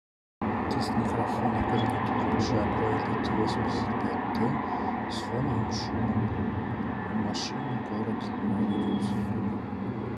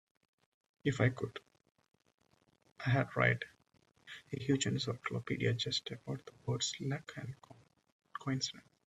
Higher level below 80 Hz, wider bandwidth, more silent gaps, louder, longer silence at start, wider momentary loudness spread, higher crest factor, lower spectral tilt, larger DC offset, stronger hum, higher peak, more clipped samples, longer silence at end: first, -48 dBFS vs -70 dBFS; first, 12 kHz vs 9.4 kHz; second, none vs 2.14-2.18 s, 7.92-8.00 s; first, -29 LUFS vs -36 LUFS; second, 0.4 s vs 0.85 s; second, 5 LU vs 16 LU; second, 14 dB vs 24 dB; first, -6.5 dB/octave vs -4.5 dB/octave; neither; neither; about the same, -14 dBFS vs -14 dBFS; neither; second, 0 s vs 0.25 s